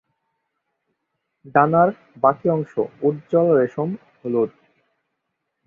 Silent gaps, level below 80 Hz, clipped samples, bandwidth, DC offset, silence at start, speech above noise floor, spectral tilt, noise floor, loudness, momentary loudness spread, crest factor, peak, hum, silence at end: none; -64 dBFS; under 0.1%; 4.2 kHz; under 0.1%; 1.45 s; 58 dB; -10.5 dB/octave; -77 dBFS; -20 LUFS; 10 LU; 20 dB; -2 dBFS; none; 1.2 s